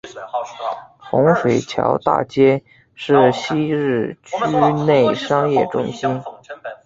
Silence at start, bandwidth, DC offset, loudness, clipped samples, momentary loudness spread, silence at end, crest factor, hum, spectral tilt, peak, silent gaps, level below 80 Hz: 0.05 s; 7.8 kHz; under 0.1%; -18 LUFS; under 0.1%; 13 LU; 0.1 s; 16 dB; none; -6.5 dB/octave; -2 dBFS; none; -56 dBFS